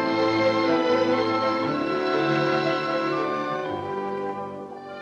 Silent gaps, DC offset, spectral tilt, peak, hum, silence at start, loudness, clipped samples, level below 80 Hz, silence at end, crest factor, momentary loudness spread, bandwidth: none; under 0.1%; -6 dB/octave; -10 dBFS; none; 0 s; -24 LUFS; under 0.1%; -64 dBFS; 0 s; 14 dB; 9 LU; 8 kHz